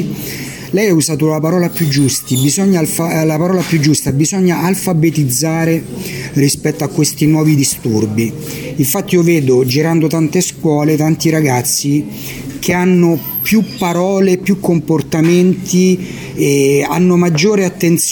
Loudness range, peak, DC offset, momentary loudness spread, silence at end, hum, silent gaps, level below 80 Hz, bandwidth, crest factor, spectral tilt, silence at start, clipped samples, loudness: 1 LU; 0 dBFS; under 0.1%; 7 LU; 0 s; none; none; -46 dBFS; 17.5 kHz; 12 dB; -5 dB/octave; 0 s; under 0.1%; -13 LUFS